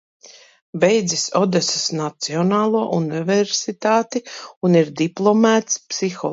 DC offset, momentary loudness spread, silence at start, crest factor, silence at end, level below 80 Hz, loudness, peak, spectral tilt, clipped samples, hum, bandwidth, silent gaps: under 0.1%; 8 LU; 0.25 s; 18 dB; 0 s; -66 dBFS; -19 LUFS; -2 dBFS; -4.5 dB/octave; under 0.1%; none; 8 kHz; 0.62-0.73 s, 4.57-4.61 s